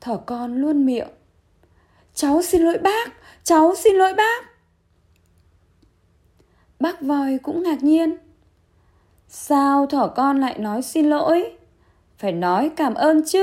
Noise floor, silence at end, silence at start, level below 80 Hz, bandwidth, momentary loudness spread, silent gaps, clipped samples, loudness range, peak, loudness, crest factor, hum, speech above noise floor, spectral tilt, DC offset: -61 dBFS; 0 s; 0.05 s; -54 dBFS; 16 kHz; 12 LU; none; under 0.1%; 5 LU; -4 dBFS; -19 LUFS; 16 dB; none; 42 dB; -4.5 dB/octave; under 0.1%